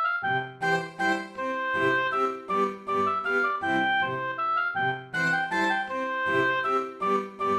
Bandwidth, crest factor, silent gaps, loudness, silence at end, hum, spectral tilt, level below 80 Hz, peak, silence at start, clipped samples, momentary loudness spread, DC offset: 13 kHz; 14 dB; none; -26 LUFS; 0 s; none; -5 dB/octave; -68 dBFS; -14 dBFS; 0 s; under 0.1%; 4 LU; under 0.1%